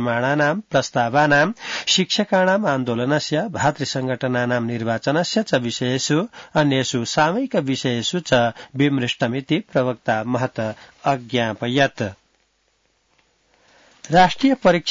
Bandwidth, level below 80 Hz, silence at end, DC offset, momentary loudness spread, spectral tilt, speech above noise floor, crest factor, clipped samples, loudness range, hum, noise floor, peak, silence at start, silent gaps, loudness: 7.8 kHz; -56 dBFS; 0 s; under 0.1%; 7 LU; -4.5 dB/octave; 46 dB; 16 dB; under 0.1%; 5 LU; none; -65 dBFS; -4 dBFS; 0 s; none; -20 LUFS